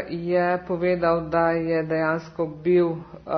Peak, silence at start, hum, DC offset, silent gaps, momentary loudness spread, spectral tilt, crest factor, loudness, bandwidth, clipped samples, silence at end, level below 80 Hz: -8 dBFS; 0 s; none; under 0.1%; none; 6 LU; -9 dB/octave; 16 dB; -23 LUFS; 6.2 kHz; under 0.1%; 0 s; -52 dBFS